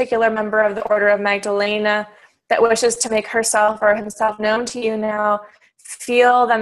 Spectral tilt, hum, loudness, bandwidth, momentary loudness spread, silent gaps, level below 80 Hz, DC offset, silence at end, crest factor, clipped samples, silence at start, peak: -2.5 dB/octave; none; -17 LUFS; 12.5 kHz; 7 LU; none; -58 dBFS; under 0.1%; 0 s; 16 dB; under 0.1%; 0 s; -2 dBFS